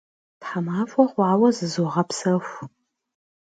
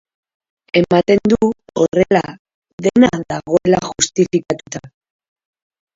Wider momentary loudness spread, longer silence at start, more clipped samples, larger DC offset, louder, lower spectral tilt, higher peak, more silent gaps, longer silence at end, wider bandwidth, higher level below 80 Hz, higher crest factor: first, 19 LU vs 11 LU; second, 0.4 s vs 0.75 s; neither; neither; second, -22 LUFS vs -16 LUFS; about the same, -6 dB/octave vs -5 dB/octave; second, -4 dBFS vs 0 dBFS; second, none vs 2.39-2.45 s, 2.54-2.62 s, 2.73-2.78 s; second, 0.75 s vs 1.1 s; first, 9.2 kHz vs 7.8 kHz; second, -70 dBFS vs -48 dBFS; about the same, 20 dB vs 16 dB